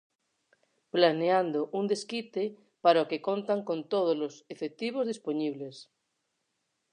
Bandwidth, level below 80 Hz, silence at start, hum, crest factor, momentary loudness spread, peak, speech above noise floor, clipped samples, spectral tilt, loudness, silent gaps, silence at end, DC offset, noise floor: 10 kHz; -88 dBFS; 0.95 s; none; 22 dB; 12 LU; -8 dBFS; 51 dB; under 0.1%; -5.5 dB/octave; -30 LUFS; none; 1.1 s; under 0.1%; -80 dBFS